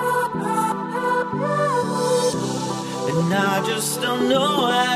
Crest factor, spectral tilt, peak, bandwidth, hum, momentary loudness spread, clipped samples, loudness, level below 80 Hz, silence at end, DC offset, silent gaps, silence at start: 14 dB; -4 dB/octave; -8 dBFS; 15.5 kHz; none; 6 LU; under 0.1%; -21 LUFS; -60 dBFS; 0 s; under 0.1%; none; 0 s